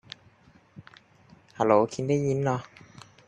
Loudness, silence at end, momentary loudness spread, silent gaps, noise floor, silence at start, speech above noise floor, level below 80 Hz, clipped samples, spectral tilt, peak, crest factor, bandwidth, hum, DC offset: -26 LUFS; 0.65 s; 24 LU; none; -58 dBFS; 0.8 s; 33 dB; -64 dBFS; under 0.1%; -7 dB/octave; -6 dBFS; 22 dB; 10 kHz; none; under 0.1%